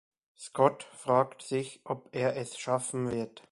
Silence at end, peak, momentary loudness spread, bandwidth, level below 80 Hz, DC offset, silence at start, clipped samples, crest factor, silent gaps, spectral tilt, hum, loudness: 0.1 s; -8 dBFS; 11 LU; 11.5 kHz; -68 dBFS; under 0.1%; 0.4 s; under 0.1%; 22 dB; none; -5 dB/octave; none; -31 LUFS